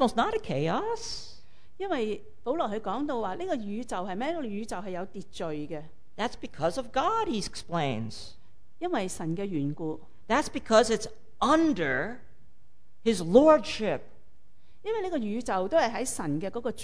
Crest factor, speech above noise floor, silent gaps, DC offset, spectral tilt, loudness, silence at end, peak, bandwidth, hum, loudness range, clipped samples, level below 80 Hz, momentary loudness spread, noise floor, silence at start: 24 dB; 38 dB; none; 1%; -5 dB/octave; -29 LUFS; 0 s; -6 dBFS; 11 kHz; none; 8 LU; under 0.1%; -54 dBFS; 14 LU; -66 dBFS; 0 s